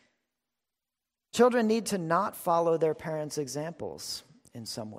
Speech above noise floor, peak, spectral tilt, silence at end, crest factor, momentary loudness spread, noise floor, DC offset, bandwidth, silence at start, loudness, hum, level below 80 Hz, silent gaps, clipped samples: 61 dB; -12 dBFS; -4.5 dB/octave; 0 s; 18 dB; 14 LU; -89 dBFS; under 0.1%; 16 kHz; 1.35 s; -29 LUFS; none; -70 dBFS; none; under 0.1%